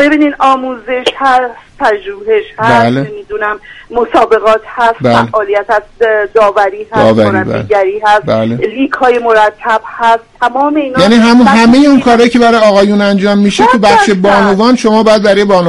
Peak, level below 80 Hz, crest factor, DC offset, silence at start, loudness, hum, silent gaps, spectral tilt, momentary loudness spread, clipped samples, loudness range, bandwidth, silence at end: 0 dBFS; -40 dBFS; 8 dB; under 0.1%; 0 s; -8 LUFS; none; none; -5.5 dB/octave; 8 LU; 0.4%; 5 LU; 11.5 kHz; 0 s